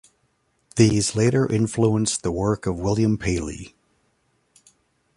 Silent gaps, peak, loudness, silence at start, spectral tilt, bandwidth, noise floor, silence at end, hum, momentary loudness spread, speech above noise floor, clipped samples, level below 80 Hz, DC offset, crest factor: none; -4 dBFS; -21 LUFS; 0.75 s; -5.5 dB/octave; 11.5 kHz; -68 dBFS; 1.5 s; none; 9 LU; 47 dB; under 0.1%; -44 dBFS; under 0.1%; 20 dB